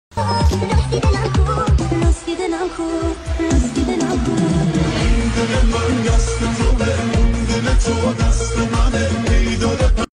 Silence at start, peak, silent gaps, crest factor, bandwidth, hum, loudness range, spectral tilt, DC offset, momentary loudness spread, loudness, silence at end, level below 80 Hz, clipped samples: 0.15 s; -4 dBFS; none; 12 dB; 11 kHz; none; 1 LU; -5.5 dB/octave; under 0.1%; 4 LU; -18 LUFS; 0.05 s; -20 dBFS; under 0.1%